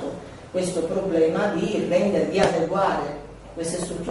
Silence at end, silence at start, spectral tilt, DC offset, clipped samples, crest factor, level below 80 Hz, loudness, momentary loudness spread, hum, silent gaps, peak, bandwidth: 0 s; 0 s; -5.5 dB/octave; under 0.1%; under 0.1%; 22 dB; -48 dBFS; -23 LUFS; 12 LU; none; none; -2 dBFS; 11.5 kHz